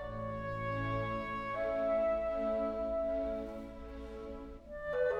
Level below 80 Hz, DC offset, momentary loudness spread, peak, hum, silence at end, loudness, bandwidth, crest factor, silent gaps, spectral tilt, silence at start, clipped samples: -52 dBFS; under 0.1%; 14 LU; -24 dBFS; none; 0 s; -37 LUFS; 7.6 kHz; 14 dB; none; -8 dB/octave; 0 s; under 0.1%